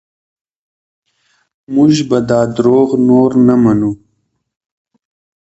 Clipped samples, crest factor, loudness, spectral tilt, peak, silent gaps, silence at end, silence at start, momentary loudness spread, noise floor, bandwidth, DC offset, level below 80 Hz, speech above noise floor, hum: under 0.1%; 14 dB; -11 LUFS; -7.5 dB/octave; 0 dBFS; none; 1.45 s; 1.7 s; 8 LU; -65 dBFS; 8 kHz; under 0.1%; -48 dBFS; 55 dB; none